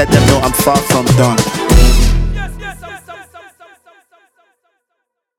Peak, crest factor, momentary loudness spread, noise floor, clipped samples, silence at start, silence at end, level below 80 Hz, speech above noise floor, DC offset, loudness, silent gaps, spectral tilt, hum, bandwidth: 0 dBFS; 12 dB; 21 LU; -72 dBFS; 0.3%; 0 s; 2 s; -16 dBFS; 61 dB; under 0.1%; -12 LUFS; none; -5 dB/octave; none; 17 kHz